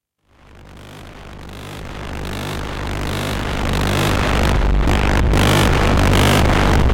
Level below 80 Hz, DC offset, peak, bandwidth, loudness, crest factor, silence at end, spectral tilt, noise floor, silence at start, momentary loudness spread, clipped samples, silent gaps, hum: -22 dBFS; under 0.1%; -6 dBFS; 17 kHz; -17 LUFS; 10 dB; 0 s; -5 dB/octave; -51 dBFS; 0.55 s; 21 LU; under 0.1%; none; none